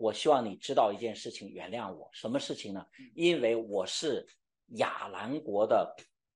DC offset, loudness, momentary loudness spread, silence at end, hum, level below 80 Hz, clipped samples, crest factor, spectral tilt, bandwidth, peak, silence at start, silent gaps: under 0.1%; -32 LUFS; 14 LU; 0.35 s; none; -80 dBFS; under 0.1%; 20 dB; -4 dB/octave; 11.5 kHz; -12 dBFS; 0 s; none